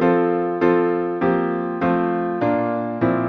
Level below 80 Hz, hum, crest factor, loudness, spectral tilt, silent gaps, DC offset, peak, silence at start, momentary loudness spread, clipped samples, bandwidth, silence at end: -56 dBFS; none; 16 dB; -20 LUFS; -10 dB/octave; none; under 0.1%; -4 dBFS; 0 s; 4 LU; under 0.1%; 5 kHz; 0 s